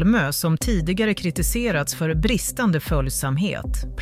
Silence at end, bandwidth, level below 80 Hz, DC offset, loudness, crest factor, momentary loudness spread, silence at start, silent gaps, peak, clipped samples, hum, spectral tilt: 0 s; 16 kHz; -30 dBFS; under 0.1%; -22 LUFS; 14 dB; 3 LU; 0 s; none; -8 dBFS; under 0.1%; none; -5 dB/octave